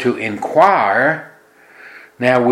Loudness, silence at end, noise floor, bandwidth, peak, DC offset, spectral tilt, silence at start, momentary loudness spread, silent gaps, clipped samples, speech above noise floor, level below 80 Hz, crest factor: -15 LUFS; 0 s; -45 dBFS; 12.5 kHz; 0 dBFS; under 0.1%; -6 dB/octave; 0 s; 9 LU; none; under 0.1%; 31 dB; -62 dBFS; 16 dB